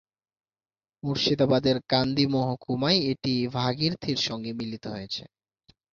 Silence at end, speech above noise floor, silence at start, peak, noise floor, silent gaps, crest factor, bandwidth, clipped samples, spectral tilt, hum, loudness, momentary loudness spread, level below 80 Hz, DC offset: 0.65 s; over 64 dB; 1.05 s; -8 dBFS; under -90 dBFS; none; 20 dB; 7.4 kHz; under 0.1%; -6 dB/octave; none; -26 LUFS; 12 LU; -58 dBFS; under 0.1%